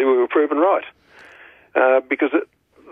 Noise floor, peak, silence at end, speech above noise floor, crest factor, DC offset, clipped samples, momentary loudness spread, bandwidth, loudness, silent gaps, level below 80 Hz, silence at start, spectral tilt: -47 dBFS; -4 dBFS; 0.45 s; 29 dB; 16 dB; under 0.1%; under 0.1%; 7 LU; 3.8 kHz; -18 LUFS; none; -70 dBFS; 0 s; -6 dB/octave